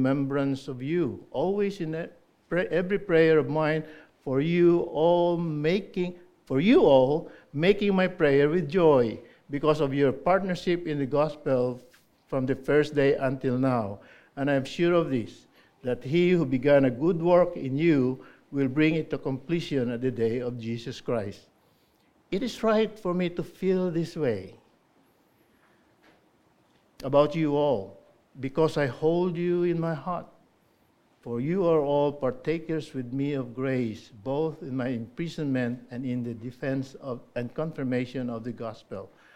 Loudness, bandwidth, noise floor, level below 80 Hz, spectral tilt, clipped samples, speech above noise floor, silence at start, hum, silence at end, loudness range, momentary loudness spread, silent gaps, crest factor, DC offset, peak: -26 LUFS; 11.5 kHz; -65 dBFS; -56 dBFS; -7.5 dB/octave; under 0.1%; 39 dB; 0 s; none; 0.3 s; 8 LU; 13 LU; none; 18 dB; under 0.1%; -8 dBFS